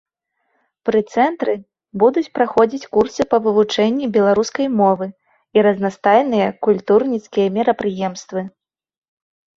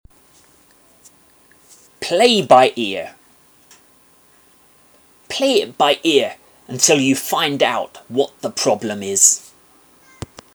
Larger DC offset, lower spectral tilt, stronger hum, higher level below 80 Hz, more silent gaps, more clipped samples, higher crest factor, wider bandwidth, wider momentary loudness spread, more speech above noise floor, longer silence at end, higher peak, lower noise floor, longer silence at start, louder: neither; first, -6 dB/octave vs -2 dB/octave; neither; about the same, -58 dBFS vs -60 dBFS; neither; neither; about the same, 18 dB vs 20 dB; second, 7.6 kHz vs over 20 kHz; second, 10 LU vs 16 LU; first, 54 dB vs 36 dB; about the same, 1.1 s vs 1.15 s; about the same, 0 dBFS vs 0 dBFS; first, -70 dBFS vs -52 dBFS; second, 0.85 s vs 2 s; about the same, -17 LUFS vs -16 LUFS